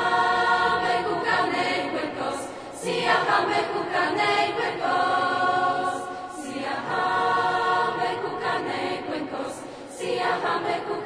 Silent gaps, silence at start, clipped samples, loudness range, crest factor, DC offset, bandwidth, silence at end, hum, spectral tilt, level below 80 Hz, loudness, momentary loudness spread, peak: none; 0 s; under 0.1%; 3 LU; 16 dB; under 0.1%; 11 kHz; 0 s; none; -3.5 dB/octave; -60 dBFS; -24 LUFS; 11 LU; -8 dBFS